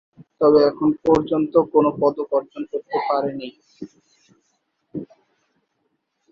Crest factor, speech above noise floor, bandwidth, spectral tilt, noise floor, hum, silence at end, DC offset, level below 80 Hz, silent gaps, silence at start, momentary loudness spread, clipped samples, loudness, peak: 18 dB; 53 dB; 7.2 kHz; -8 dB/octave; -72 dBFS; none; 1.3 s; under 0.1%; -56 dBFS; none; 0.2 s; 21 LU; under 0.1%; -19 LUFS; -4 dBFS